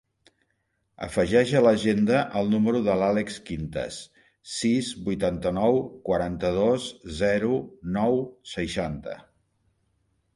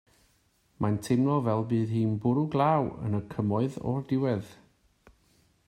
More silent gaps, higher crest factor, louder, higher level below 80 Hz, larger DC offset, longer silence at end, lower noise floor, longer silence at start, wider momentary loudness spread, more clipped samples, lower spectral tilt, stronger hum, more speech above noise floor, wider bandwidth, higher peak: neither; about the same, 18 dB vs 18 dB; first, -25 LUFS vs -28 LUFS; first, -50 dBFS vs -62 dBFS; neither; about the same, 1.15 s vs 1.15 s; first, -74 dBFS vs -68 dBFS; first, 1 s vs 0.8 s; first, 14 LU vs 8 LU; neither; second, -6 dB/octave vs -8.5 dB/octave; neither; first, 49 dB vs 41 dB; second, 11.5 kHz vs 15 kHz; first, -8 dBFS vs -12 dBFS